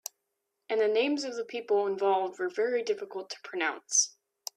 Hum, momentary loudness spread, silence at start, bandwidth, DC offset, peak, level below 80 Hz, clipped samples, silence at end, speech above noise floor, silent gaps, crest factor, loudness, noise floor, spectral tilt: none; 12 LU; 0.7 s; 14.5 kHz; under 0.1%; -12 dBFS; -82 dBFS; under 0.1%; 0.45 s; 53 dB; none; 20 dB; -30 LUFS; -83 dBFS; -1 dB/octave